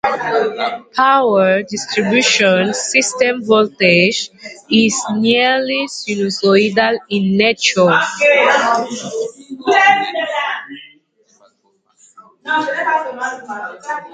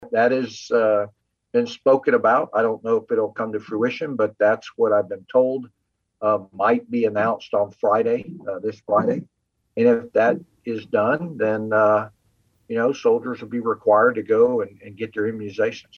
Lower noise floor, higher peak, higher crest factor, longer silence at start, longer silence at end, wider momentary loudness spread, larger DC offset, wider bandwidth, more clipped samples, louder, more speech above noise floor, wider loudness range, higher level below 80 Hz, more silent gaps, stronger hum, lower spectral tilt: second, -60 dBFS vs -64 dBFS; first, 0 dBFS vs -4 dBFS; about the same, 16 dB vs 16 dB; about the same, 0.05 s vs 0 s; second, 0 s vs 0.2 s; about the same, 13 LU vs 11 LU; neither; first, 9.6 kHz vs 7 kHz; neither; first, -14 LUFS vs -21 LUFS; about the same, 46 dB vs 44 dB; first, 8 LU vs 2 LU; first, -62 dBFS vs -70 dBFS; neither; neither; second, -3.5 dB/octave vs -6.5 dB/octave